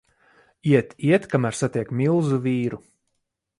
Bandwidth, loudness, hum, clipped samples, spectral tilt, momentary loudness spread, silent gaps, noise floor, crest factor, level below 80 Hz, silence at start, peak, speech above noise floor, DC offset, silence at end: 11.5 kHz; -22 LUFS; none; under 0.1%; -7 dB/octave; 8 LU; none; -77 dBFS; 18 dB; -60 dBFS; 0.65 s; -4 dBFS; 56 dB; under 0.1%; 0.85 s